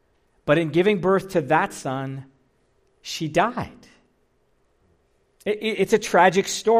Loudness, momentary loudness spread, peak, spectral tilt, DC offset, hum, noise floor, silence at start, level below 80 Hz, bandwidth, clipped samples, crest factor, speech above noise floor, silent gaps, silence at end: -22 LUFS; 16 LU; -4 dBFS; -5 dB/octave; under 0.1%; none; -65 dBFS; 0.45 s; -58 dBFS; 15.5 kHz; under 0.1%; 18 dB; 44 dB; none; 0 s